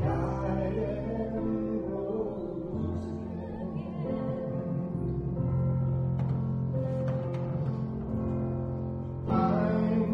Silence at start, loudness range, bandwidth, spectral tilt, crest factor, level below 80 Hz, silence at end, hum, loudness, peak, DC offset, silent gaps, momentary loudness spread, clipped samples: 0 s; 3 LU; 5.6 kHz; -10.5 dB/octave; 16 dB; -46 dBFS; 0 s; none; -32 LUFS; -14 dBFS; under 0.1%; none; 8 LU; under 0.1%